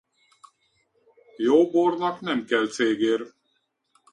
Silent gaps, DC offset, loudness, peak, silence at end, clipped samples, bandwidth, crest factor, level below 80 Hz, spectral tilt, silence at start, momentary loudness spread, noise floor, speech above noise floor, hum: none; under 0.1%; -23 LUFS; -6 dBFS; 0.85 s; under 0.1%; 10.5 kHz; 18 dB; -72 dBFS; -4.5 dB/octave; 1.4 s; 9 LU; -73 dBFS; 51 dB; none